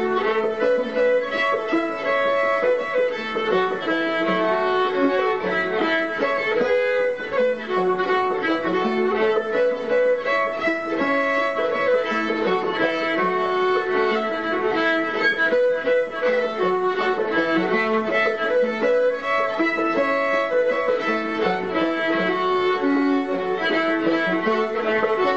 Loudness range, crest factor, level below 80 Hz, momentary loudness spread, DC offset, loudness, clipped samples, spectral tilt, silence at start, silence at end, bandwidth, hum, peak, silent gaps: 1 LU; 14 dB; -60 dBFS; 3 LU; 0.3%; -21 LUFS; under 0.1%; -5.5 dB/octave; 0 s; 0 s; 8 kHz; none; -6 dBFS; none